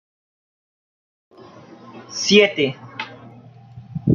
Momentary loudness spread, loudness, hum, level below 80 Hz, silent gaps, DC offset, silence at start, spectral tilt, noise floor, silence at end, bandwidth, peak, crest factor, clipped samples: 23 LU; -17 LUFS; none; -58 dBFS; none; under 0.1%; 1.9 s; -4.5 dB/octave; -43 dBFS; 0 s; 7.4 kHz; -2 dBFS; 22 dB; under 0.1%